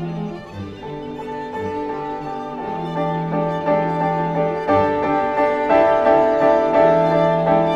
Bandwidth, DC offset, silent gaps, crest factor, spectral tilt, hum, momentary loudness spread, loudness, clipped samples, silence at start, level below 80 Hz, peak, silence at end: 7.6 kHz; under 0.1%; none; 16 dB; -8 dB/octave; none; 15 LU; -18 LUFS; under 0.1%; 0 s; -48 dBFS; -2 dBFS; 0 s